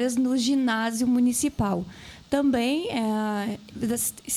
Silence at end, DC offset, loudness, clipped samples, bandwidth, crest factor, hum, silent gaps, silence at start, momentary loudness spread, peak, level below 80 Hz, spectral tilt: 0 s; under 0.1%; -25 LUFS; under 0.1%; 16 kHz; 16 dB; none; none; 0 s; 9 LU; -10 dBFS; -52 dBFS; -4 dB/octave